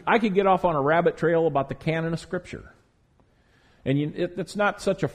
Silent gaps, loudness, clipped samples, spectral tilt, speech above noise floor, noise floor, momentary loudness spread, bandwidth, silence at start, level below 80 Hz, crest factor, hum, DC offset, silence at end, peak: none; -24 LUFS; under 0.1%; -7 dB/octave; 38 dB; -62 dBFS; 12 LU; 13 kHz; 0.05 s; -52 dBFS; 18 dB; none; under 0.1%; 0 s; -6 dBFS